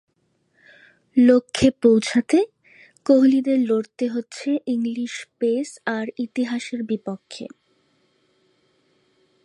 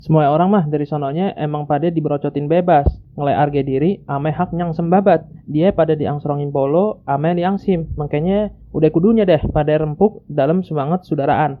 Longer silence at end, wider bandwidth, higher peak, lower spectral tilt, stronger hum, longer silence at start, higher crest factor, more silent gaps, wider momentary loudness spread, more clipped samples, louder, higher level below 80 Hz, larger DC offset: first, 2 s vs 0 s; first, 11 kHz vs 5 kHz; second, -4 dBFS vs 0 dBFS; second, -5 dB/octave vs -11 dB/octave; neither; first, 1.15 s vs 0.05 s; about the same, 18 dB vs 16 dB; neither; first, 14 LU vs 7 LU; neither; second, -21 LUFS vs -17 LUFS; second, -56 dBFS vs -34 dBFS; neither